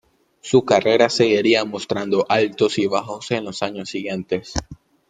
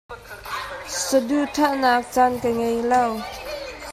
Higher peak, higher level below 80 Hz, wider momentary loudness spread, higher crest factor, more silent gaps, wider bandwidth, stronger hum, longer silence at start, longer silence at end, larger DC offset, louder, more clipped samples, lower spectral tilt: first, -2 dBFS vs -6 dBFS; about the same, -48 dBFS vs -50 dBFS; about the same, 11 LU vs 13 LU; about the same, 18 dB vs 16 dB; neither; second, 9.4 kHz vs 16 kHz; neither; first, 0.45 s vs 0.1 s; first, 0.35 s vs 0 s; neither; about the same, -20 LUFS vs -22 LUFS; neither; first, -4.5 dB/octave vs -3 dB/octave